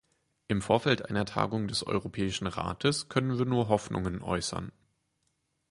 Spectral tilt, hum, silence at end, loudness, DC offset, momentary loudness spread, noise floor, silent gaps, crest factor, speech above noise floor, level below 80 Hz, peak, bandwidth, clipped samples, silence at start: -5 dB/octave; none; 1 s; -30 LUFS; under 0.1%; 7 LU; -77 dBFS; none; 22 dB; 47 dB; -52 dBFS; -10 dBFS; 11.5 kHz; under 0.1%; 0.5 s